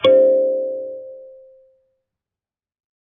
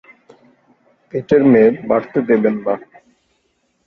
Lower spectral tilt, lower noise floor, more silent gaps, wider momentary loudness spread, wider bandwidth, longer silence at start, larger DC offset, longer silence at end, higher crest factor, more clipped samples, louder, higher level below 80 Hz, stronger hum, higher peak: second, -2.5 dB/octave vs -9.5 dB/octave; first, under -90 dBFS vs -65 dBFS; neither; first, 24 LU vs 14 LU; second, 4.2 kHz vs 5.2 kHz; second, 0 s vs 1.15 s; neither; first, 1.95 s vs 1.05 s; about the same, 18 dB vs 16 dB; neither; about the same, -17 LUFS vs -15 LUFS; second, -76 dBFS vs -56 dBFS; neither; about the same, -2 dBFS vs -2 dBFS